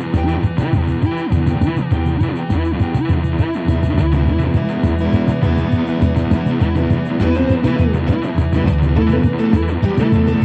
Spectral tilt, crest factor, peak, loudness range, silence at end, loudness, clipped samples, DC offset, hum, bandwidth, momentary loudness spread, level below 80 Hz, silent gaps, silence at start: -9.5 dB/octave; 14 dB; -2 dBFS; 2 LU; 0 s; -17 LUFS; under 0.1%; under 0.1%; none; 5.6 kHz; 3 LU; -24 dBFS; none; 0 s